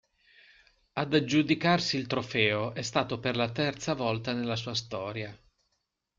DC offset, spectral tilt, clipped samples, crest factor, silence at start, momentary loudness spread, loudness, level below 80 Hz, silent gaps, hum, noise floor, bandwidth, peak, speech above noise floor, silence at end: under 0.1%; -5 dB/octave; under 0.1%; 20 dB; 0.95 s; 10 LU; -29 LUFS; -64 dBFS; none; none; -80 dBFS; 7.6 kHz; -10 dBFS; 51 dB; 0.8 s